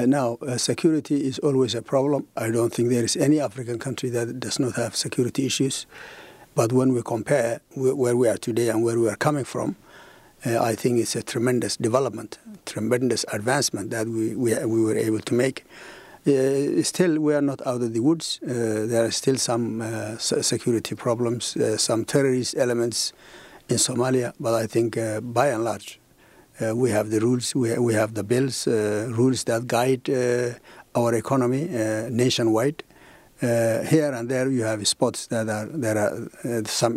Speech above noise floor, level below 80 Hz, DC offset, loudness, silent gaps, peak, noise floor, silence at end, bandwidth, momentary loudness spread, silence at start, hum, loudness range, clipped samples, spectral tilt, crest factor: 31 dB; -64 dBFS; under 0.1%; -23 LUFS; none; -6 dBFS; -54 dBFS; 0 s; 16 kHz; 7 LU; 0 s; none; 2 LU; under 0.1%; -4.5 dB/octave; 18 dB